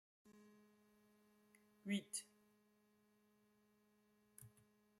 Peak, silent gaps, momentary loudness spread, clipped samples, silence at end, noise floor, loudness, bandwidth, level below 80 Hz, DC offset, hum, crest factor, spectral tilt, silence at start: -32 dBFS; none; 24 LU; under 0.1%; 0.5 s; -78 dBFS; -47 LUFS; 16 kHz; under -90 dBFS; under 0.1%; none; 26 dB; -3.5 dB/octave; 0.25 s